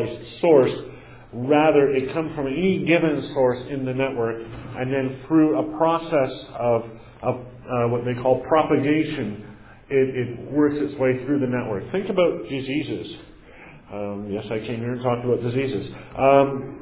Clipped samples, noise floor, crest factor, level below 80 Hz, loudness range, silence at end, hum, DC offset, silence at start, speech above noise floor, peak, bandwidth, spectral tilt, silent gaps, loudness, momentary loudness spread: under 0.1%; -45 dBFS; 18 dB; -52 dBFS; 6 LU; 0 s; none; under 0.1%; 0 s; 23 dB; -4 dBFS; 4 kHz; -11 dB/octave; none; -22 LUFS; 14 LU